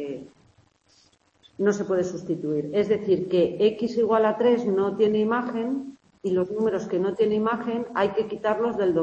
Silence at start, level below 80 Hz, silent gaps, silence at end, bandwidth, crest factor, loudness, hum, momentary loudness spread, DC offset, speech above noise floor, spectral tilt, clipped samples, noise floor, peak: 0 s; -64 dBFS; none; 0 s; 8 kHz; 16 dB; -24 LUFS; none; 7 LU; under 0.1%; 38 dB; -7 dB/octave; under 0.1%; -62 dBFS; -8 dBFS